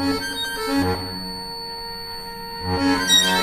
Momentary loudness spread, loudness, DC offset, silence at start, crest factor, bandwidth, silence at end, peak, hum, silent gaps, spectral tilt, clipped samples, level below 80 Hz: 15 LU; -22 LUFS; under 0.1%; 0 s; 18 dB; 15.5 kHz; 0 s; -6 dBFS; none; none; -2.5 dB/octave; under 0.1%; -44 dBFS